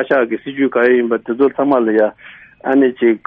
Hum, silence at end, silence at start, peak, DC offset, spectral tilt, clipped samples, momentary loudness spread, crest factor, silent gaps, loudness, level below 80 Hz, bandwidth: none; 0.1 s; 0 s; -2 dBFS; under 0.1%; -4.5 dB/octave; under 0.1%; 6 LU; 12 dB; none; -15 LUFS; -60 dBFS; 4.3 kHz